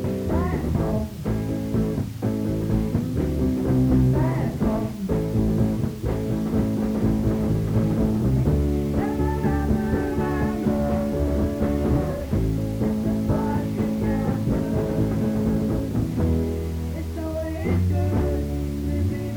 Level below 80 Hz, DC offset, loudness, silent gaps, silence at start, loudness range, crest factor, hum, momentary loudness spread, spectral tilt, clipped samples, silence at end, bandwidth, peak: -32 dBFS; under 0.1%; -24 LUFS; none; 0 s; 2 LU; 14 dB; none; 5 LU; -8.5 dB/octave; under 0.1%; 0 s; over 20 kHz; -8 dBFS